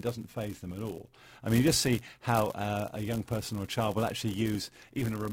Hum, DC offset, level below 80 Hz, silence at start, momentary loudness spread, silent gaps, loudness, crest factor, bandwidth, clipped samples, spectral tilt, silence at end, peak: none; under 0.1%; -54 dBFS; 0 s; 13 LU; none; -32 LUFS; 20 dB; 16.5 kHz; under 0.1%; -5 dB/octave; 0 s; -12 dBFS